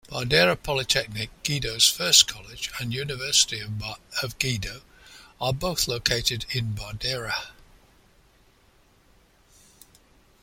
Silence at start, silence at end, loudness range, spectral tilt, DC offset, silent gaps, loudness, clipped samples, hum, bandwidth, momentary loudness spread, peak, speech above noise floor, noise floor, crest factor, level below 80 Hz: 0.1 s; 2.9 s; 13 LU; -2 dB/octave; under 0.1%; none; -23 LUFS; under 0.1%; none; 16.5 kHz; 14 LU; -2 dBFS; 34 dB; -59 dBFS; 26 dB; -48 dBFS